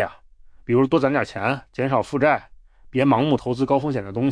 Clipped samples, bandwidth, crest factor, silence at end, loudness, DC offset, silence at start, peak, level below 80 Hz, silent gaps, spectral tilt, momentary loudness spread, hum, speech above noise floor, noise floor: under 0.1%; 10 kHz; 16 dB; 0 s; -21 LUFS; under 0.1%; 0 s; -6 dBFS; -52 dBFS; none; -7.5 dB/octave; 7 LU; none; 27 dB; -47 dBFS